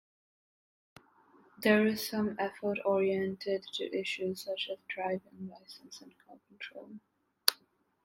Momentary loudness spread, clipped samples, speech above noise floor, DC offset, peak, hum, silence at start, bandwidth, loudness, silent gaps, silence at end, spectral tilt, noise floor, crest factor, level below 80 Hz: 22 LU; under 0.1%; 35 dB; under 0.1%; -2 dBFS; none; 1.6 s; 16 kHz; -33 LUFS; none; 0.5 s; -4 dB/octave; -69 dBFS; 34 dB; -78 dBFS